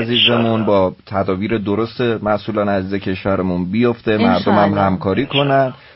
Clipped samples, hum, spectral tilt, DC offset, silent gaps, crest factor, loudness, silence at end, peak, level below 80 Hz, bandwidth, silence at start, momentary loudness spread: under 0.1%; none; -10.5 dB/octave; under 0.1%; none; 14 dB; -16 LUFS; 0.2 s; -2 dBFS; -48 dBFS; 5.8 kHz; 0 s; 6 LU